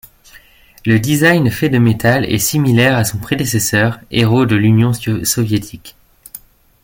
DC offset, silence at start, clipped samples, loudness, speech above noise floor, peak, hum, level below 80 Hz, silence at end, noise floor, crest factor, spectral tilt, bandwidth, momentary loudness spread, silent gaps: under 0.1%; 0.85 s; under 0.1%; -14 LUFS; 31 dB; 0 dBFS; none; -42 dBFS; 0.45 s; -44 dBFS; 14 dB; -5 dB/octave; 17 kHz; 10 LU; none